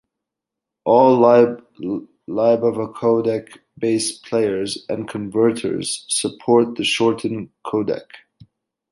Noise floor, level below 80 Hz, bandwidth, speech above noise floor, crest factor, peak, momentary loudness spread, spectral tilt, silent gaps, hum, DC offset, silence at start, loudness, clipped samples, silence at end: -84 dBFS; -62 dBFS; 11.5 kHz; 66 dB; 18 dB; -2 dBFS; 14 LU; -4.5 dB/octave; none; none; under 0.1%; 0.85 s; -19 LUFS; under 0.1%; 0.75 s